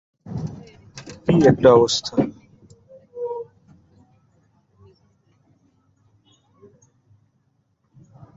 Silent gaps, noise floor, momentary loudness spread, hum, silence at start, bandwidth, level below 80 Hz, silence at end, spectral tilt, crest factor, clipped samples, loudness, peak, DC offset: none; -67 dBFS; 28 LU; none; 0.25 s; 8 kHz; -52 dBFS; 4.95 s; -6 dB/octave; 22 dB; under 0.1%; -19 LUFS; -2 dBFS; under 0.1%